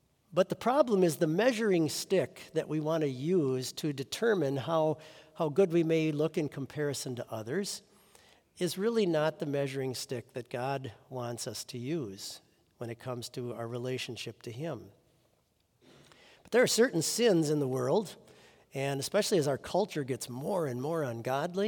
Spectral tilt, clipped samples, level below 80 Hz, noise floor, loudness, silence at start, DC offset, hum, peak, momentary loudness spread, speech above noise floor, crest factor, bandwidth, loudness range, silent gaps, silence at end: -5 dB/octave; under 0.1%; -76 dBFS; -73 dBFS; -32 LUFS; 0.3 s; under 0.1%; none; -12 dBFS; 13 LU; 41 dB; 20 dB; 18 kHz; 10 LU; none; 0 s